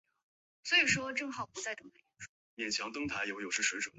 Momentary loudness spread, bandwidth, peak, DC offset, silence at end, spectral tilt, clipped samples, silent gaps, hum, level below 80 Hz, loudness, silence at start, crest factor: 23 LU; 8.2 kHz; -16 dBFS; under 0.1%; 0.1 s; -1.5 dB/octave; under 0.1%; 2.29-2.57 s; none; -70 dBFS; -33 LUFS; 0.65 s; 22 dB